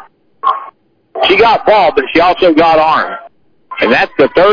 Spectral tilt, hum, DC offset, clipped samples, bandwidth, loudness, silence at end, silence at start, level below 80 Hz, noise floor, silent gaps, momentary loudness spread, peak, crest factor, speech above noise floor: -5.5 dB/octave; none; under 0.1%; under 0.1%; 5.4 kHz; -10 LUFS; 0 s; 0.45 s; -42 dBFS; -39 dBFS; none; 13 LU; 0 dBFS; 10 dB; 30 dB